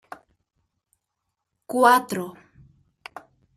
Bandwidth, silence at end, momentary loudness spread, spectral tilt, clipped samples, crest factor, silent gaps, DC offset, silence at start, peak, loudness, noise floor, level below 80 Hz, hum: 15 kHz; 1.25 s; 25 LU; -4 dB/octave; under 0.1%; 24 dB; none; under 0.1%; 1.7 s; -4 dBFS; -20 LUFS; -81 dBFS; -70 dBFS; none